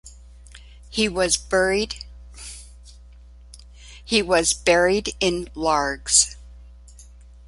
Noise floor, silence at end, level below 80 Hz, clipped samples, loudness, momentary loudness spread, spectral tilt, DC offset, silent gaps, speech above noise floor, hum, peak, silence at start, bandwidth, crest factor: -45 dBFS; 0.45 s; -42 dBFS; under 0.1%; -20 LUFS; 21 LU; -2 dB/octave; under 0.1%; none; 24 dB; 60 Hz at -40 dBFS; -2 dBFS; 0.05 s; 11.5 kHz; 22 dB